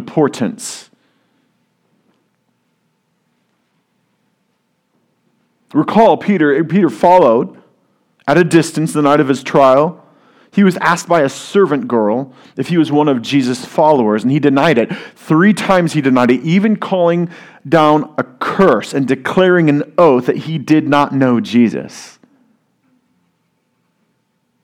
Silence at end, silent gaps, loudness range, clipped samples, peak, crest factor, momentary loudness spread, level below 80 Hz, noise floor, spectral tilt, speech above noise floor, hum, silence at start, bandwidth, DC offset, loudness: 2.55 s; none; 5 LU; 0.2%; 0 dBFS; 14 dB; 10 LU; -56 dBFS; -64 dBFS; -6.5 dB/octave; 52 dB; none; 0 s; 15.5 kHz; under 0.1%; -13 LUFS